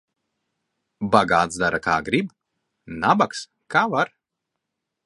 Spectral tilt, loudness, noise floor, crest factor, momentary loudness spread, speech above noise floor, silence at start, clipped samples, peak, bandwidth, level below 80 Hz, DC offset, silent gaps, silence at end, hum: -5 dB/octave; -21 LUFS; -82 dBFS; 24 dB; 13 LU; 61 dB; 1 s; under 0.1%; 0 dBFS; 11.5 kHz; -54 dBFS; under 0.1%; none; 1 s; none